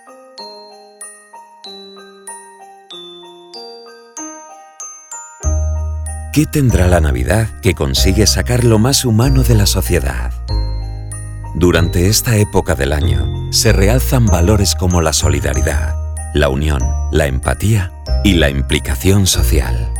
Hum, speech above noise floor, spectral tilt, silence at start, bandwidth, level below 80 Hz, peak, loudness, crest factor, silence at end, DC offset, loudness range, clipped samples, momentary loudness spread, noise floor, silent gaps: none; 27 dB; -5 dB/octave; 0.1 s; 19 kHz; -20 dBFS; 0 dBFS; -14 LUFS; 14 dB; 0 s; under 0.1%; 19 LU; under 0.1%; 20 LU; -39 dBFS; none